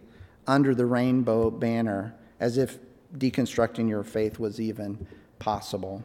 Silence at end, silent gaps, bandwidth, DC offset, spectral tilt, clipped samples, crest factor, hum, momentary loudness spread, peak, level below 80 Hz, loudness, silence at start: 0 s; none; 16 kHz; under 0.1%; -7 dB/octave; under 0.1%; 20 dB; none; 14 LU; -8 dBFS; -56 dBFS; -27 LUFS; 0.2 s